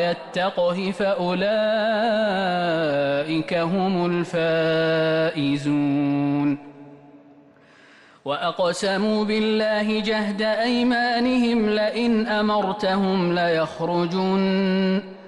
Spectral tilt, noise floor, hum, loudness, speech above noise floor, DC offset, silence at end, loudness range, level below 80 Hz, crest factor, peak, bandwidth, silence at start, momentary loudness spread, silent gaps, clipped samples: -6 dB/octave; -51 dBFS; none; -22 LUFS; 30 dB; under 0.1%; 0 s; 5 LU; -58 dBFS; 10 dB; -12 dBFS; 11.5 kHz; 0 s; 3 LU; none; under 0.1%